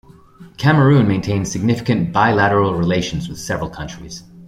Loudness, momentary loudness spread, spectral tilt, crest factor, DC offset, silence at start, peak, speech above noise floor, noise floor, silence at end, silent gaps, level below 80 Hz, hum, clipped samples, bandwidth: -17 LUFS; 15 LU; -6.5 dB/octave; 16 dB; under 0.1%; 0.4 s; -2 dBFS; 26 dB; -42 dBFS; 0 s; none; -42 dBFS; none; under 0.1%; 13.5 kHz